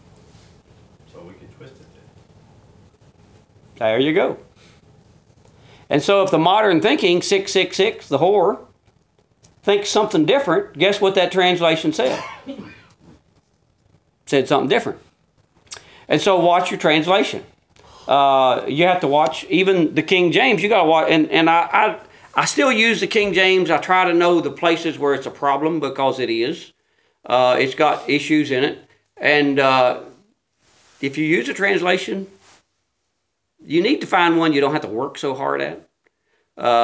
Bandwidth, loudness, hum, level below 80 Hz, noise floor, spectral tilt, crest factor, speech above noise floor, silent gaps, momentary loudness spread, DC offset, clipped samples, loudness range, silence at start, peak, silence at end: 8 kHz; -17 LUFS; none; -62 dBFS; -74 dBFS; -4.5 dB/octave; 18 dB; 57 dB; none; 11 LU; under 0.1%; under 0.1%; 8 LU; 1.15 s; 0 dBFS; 0 s